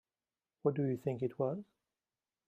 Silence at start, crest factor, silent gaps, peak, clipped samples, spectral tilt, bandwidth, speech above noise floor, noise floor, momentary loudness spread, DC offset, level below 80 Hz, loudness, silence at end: 0.65 s; 22 dB; none; -18 dBFS; under 0.1%; -10 dB/octave; 14 kHz; over 54 dB; under -90 dBFS; 4 LU; under 0.1%; -80 dBFS; -37 LUFS; 0.85 s